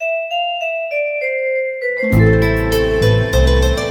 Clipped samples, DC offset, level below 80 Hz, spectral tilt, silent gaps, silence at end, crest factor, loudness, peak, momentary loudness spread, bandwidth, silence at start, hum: under 0.1%; under 0.1%; -22 dBFS; -6 dB/octave; none; 0 s; 14 dB; -16 LUFS; 0 dBFS; 7 LU; 18 kHz; 0 s; none